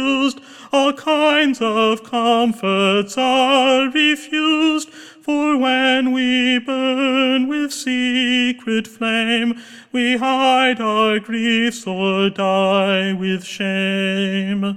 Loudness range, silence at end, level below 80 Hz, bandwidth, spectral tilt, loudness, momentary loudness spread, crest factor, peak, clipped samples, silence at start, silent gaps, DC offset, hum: 2 LU; 0 s; -64 dBFS; 14 kHz; -4.5 dB/octave; -17 LUFS; 7 LU; 16 dB; -2 dBFS; under 0.1%; 0 s; none; under 0.1%; none